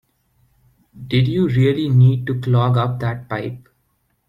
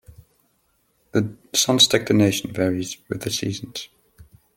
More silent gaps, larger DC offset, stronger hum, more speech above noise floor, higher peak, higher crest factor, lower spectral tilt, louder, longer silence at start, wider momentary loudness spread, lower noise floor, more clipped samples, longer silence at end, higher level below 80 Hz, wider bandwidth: neither; neither; neither; first, 49 dB vs 45 dB; about the same, -4 dBFS vs -2 dBFS; second, 14 dB vs 22 dB; first, -9 dB/octave vs -3.5 dB/octave; about the same, -18 LUFS vs -20 LUFS; second, 0.95 s vs 1.15 s; second, 12 LU vs 16 LU; about the same, -66 dBFS vs -66 dBFS; neither; first, 0.7 s vs 0.35 s; first, -50 dBFS vs -58 dBFS; second, 5.2 kHz vs 17 kHz